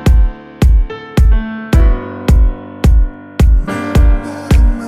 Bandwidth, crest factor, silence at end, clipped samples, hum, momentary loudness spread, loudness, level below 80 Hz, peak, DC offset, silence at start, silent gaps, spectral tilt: 12 kHz; 10 dB; 0 s; under 0.1%; none; 5 LU; -14 LUFS; -10 dBFS; 0 dBFS; under 0.1%; 0 s; none; -7.5 dB/octave